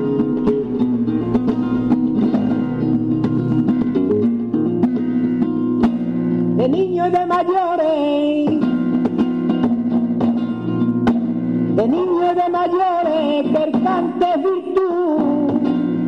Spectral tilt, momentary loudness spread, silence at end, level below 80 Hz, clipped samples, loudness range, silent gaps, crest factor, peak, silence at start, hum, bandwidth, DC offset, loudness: -9 dB/octave; 2 LU; 0 s; -48 dBFS; under 0.1%; 1 LU; none; 10 dB; -8 dBFS; 0 s; none; 5.8 kHz; 0.2%; -18 LUFS